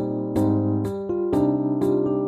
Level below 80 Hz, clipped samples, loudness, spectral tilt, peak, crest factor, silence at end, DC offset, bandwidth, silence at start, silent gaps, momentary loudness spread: -50 dBFS; under 0.1%; -23 LUFS; -9.5 dB/octave; -10 dBFS; 12 dB; 0 s; under 0.1%; 12.5 kHz; 0 s; none; 5 LU